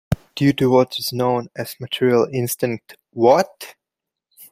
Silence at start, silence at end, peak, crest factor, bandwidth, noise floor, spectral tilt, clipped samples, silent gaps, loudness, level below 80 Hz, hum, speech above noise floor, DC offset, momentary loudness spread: 0.1 s; 0.1 s; -2 dBFS; 18 dB; 16 kHz; -85 dBFS; -5.5 dB/octave; under 0.1%; none; -19 LUFS; -46 dBFS; none; 66 dB; under 0.1%; 16 LU